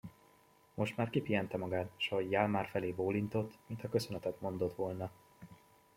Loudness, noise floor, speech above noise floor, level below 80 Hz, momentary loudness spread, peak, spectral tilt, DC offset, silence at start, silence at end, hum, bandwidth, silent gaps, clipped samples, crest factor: -37 LUFS; -67 dBFS; 30 dB; -70 dBFS; 12 LU; -16 dBFS; -6.5 dB/octave; under 0.1%; 0.05 s; 0.4 s; none; 16.5 kHz; none; under 0.1%; 22 dB